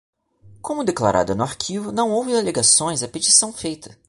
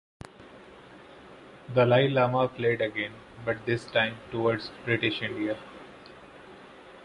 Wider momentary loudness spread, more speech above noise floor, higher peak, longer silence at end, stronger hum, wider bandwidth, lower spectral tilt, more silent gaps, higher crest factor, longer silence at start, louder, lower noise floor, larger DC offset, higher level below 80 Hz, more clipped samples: second, 14 LU vs 26 LU; first, 30 dB vs 23 dB; first, -2 dBFS vs -8 dBFS; first, 0.2 s vs 0 s; neither; about the same, 11.5 kHz vs 11 kHz; second, -2.5 dB/octave vs -7 dB/octave; neither; about the same, 20 dB vs 22 dB; about the same, 0.45 s vs 0.4 s; first, -18 LUFS vs -27 LUFS; about the same, -50 dBFS vs -50 dBFS; neither; first, -52 dBFS vs -62 dBFS; neither